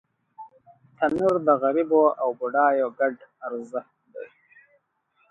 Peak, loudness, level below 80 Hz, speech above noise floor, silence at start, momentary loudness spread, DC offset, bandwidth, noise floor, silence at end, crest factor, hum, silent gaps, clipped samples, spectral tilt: -6 dBFS; -23 LUFS; -68 dBFS; 46 dB; 0.4 s; 21 LU; under 0.1%; 8 kHz; -68 dBFS; 1.05 s; 18 dB; none; none; under 0.1%; -7.5 dB/octave